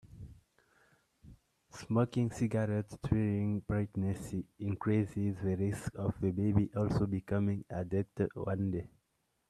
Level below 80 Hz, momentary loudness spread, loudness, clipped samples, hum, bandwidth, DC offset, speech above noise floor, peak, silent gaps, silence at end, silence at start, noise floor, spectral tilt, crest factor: -58 dBFS; 9 LU; -35 LUFS; under 0.1%; none; 12 kHz; under 0.1%; 46 dB; -14 dBFS; none; 0.6 s; 0.05 s; -79 dBFS; -8.5 dB/octave; 20 dB